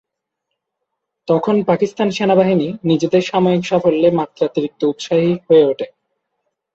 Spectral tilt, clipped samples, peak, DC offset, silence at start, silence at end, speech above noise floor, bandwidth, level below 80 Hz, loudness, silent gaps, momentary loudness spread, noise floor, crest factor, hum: -7 dB/octave; under 0.1%; -2 dBFS; under 0.1%; 1.3 s; 0.85 s; 62 dB; 7.8 kHz; -58 dBFS; -16 LUFS; none; 7 LU; -77 dBFS; 14 dB; none